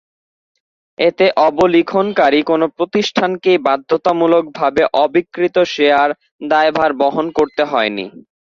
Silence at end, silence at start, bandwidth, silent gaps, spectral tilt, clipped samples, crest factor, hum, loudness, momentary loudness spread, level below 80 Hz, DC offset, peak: 0.45 s; 1 s; 7.4 kHz; 6.31-6.39 s; -5.5 dB/octave; under 0.1%; 14 dB; none; -14 LUFS; 5 LU; -54 dBFS; under 0.1%; 0 dBFS